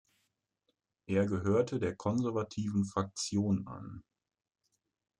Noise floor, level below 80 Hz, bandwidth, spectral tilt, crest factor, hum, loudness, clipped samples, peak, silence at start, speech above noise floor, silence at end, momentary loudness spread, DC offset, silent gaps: -82 dBFS; -68 dBFS; 11 kHz; -6.5 dB/octave; 18 dB; none; -33 LUFS; under 0.1%; -18 dBFS; 1.1 s; 49 dB; 1.2 s; 13 LU; under 0.1%; none